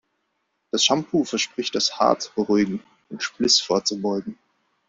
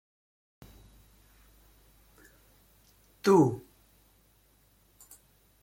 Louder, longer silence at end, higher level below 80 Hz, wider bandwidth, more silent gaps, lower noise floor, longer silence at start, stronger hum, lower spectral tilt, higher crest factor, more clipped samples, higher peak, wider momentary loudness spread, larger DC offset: first, -22 LUFS vs -26 LUFS; second, 0.55 s vs 2.05 s; about the same, -62 dBFS vs -64 dBFS; second, 7.8 kHz vs 16.5 kHz; neither; first, -74 dBFS vs -65 dBFS; second, 0.75 s vs 3.25 s; neither; second, -3 dB/octave vs -7 dB/octave; about the same, 20 dB vs 24 dB; neither; first, -4 dBFS vs -12 dBFS; second, 12 LU vs 31 LU; neither